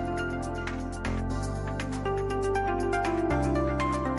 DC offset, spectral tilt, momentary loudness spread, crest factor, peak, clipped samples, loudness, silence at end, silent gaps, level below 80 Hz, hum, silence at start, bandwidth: under 0.1%; -6.5 dB/octave; 6 LU; 12 dB; -16 dBFS; under 0.1%; -30 LUFS; 0 s; none; -38 dBFS; none; 0 s; 11.5 kHz